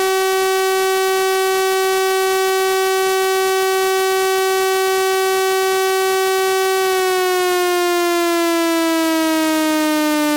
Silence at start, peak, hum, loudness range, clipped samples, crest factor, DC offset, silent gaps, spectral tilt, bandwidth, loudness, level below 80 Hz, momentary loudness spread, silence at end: 0 s; -8 dBFS; none; 0 LU; under 0.1%; 8 dB; under 0.1%; none; -1 dB/octave; 17 kHz; -16 LUFS; -60 dBFS; 0 LU; 0 s